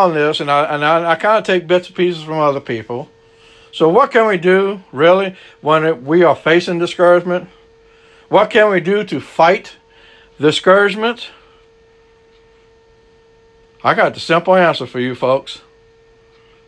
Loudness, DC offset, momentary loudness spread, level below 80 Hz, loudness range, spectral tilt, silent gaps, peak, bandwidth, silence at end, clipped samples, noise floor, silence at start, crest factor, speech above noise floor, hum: -14 LUFS; under 0.1%; 11 LU; -58 dBFS; 5 LU; -5.5 dB/octave; none; 0 dBFS; 10.5 kHz; 1.1 s; under 0.1%; -49 dBFS; 0 s; 16 dB; 36 dB; none